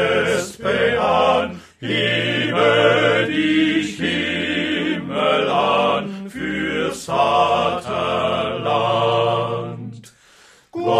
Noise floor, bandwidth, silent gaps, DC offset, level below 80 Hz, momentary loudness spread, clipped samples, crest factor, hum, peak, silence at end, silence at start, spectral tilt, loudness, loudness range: -50 dBFS; 14 kHz; none; under 0.1%; -52 dBFS; 10 LU; under 0.1%; 16 dB; none; -2 dBFS; 0 s; 0 s; -5 dB/octave; -18 LUFS; 3 LU